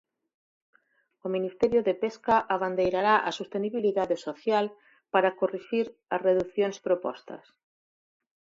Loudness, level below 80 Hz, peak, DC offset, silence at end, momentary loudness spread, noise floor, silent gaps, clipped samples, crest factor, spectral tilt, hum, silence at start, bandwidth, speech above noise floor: -27 LUFS; -64 dBFS; -8 dBFS; under 0.1%; 1.15 s; 8 LU; -69 dBFS; none; under 0.1%; 20 dB; -5.5 dB/octave; none; 1.25 s; 7.8 kHz; 42 dB